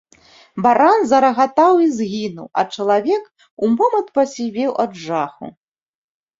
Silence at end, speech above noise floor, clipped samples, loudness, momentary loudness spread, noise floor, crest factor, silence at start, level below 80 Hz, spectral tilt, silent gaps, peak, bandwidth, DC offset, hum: 0.9 s; 33 dB; under 0.1%; -17 LUFS; 10 LU; -49 dBFS; 16 dB; 0.55 s; -62 dBFS; -5.5 dB/octave; 3.51-3.57 s; -2 dBFS; 7.8 kHz; under 0.1%; none